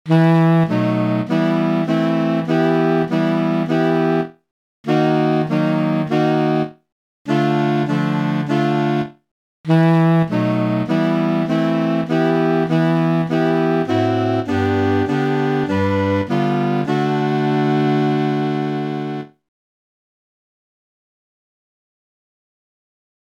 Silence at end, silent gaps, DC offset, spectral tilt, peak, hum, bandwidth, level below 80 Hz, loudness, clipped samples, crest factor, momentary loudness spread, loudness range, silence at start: 4 s; 4.51-4.84 s, 6.92-7.25 s, 9.31-9.64 s; under 0.1%; -8.5 dB/octave; -4 dBFS; none; 7.6 kHz; -62 dBFS; -18 LUFS; under 0.1%; 14 dB; 5 LU; 3 LU; 0.05 s